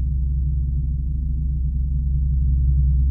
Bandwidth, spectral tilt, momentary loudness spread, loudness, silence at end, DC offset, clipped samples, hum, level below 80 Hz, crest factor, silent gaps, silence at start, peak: 0.4 kHz; -14 dB/octave; 5 LU; -23 LUFS; 0 s; under 0.1%; under 0.1%; none; -20 dBFS; 10 dB; none; 0 s; -8 dBFS